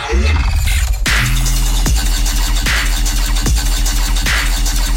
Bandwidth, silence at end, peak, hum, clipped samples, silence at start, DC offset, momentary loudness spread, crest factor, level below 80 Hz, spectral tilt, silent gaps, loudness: 16.5 kHz; 0 s; -2 dBFS; none; under 0.1%; 0 s; under 0.1%; 2 LU; 10 dB; -14 dBFS; -3 dB/octave; none; -16 LUFS